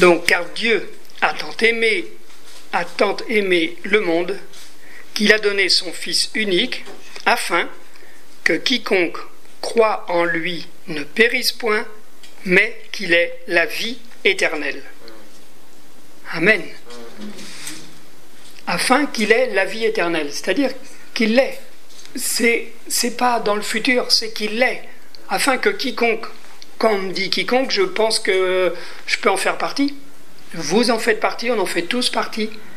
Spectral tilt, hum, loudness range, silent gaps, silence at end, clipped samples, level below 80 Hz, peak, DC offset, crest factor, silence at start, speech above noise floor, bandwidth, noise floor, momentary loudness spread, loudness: -2.5 dB/octave; none; 3 LU; none; 0 s; under 0.1%; -66 dBFS; 0 dBFS; 5%; 20 dB; 0 s; 29 dB; 16 kHz; -48 dBFS; 15 LU; -18 LUFS